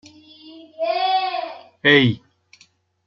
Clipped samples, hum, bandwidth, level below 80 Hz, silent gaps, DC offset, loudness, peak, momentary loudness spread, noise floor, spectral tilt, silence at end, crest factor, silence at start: under 0.1%; none; 7.4 kHz; -64 dBFS; none; under 0.1%; -19 LUFS; -2 dBFS; 16 LU; -57 dBFS; -6.5 dB/octave; 0.9 s; 20 dB; 0.45 s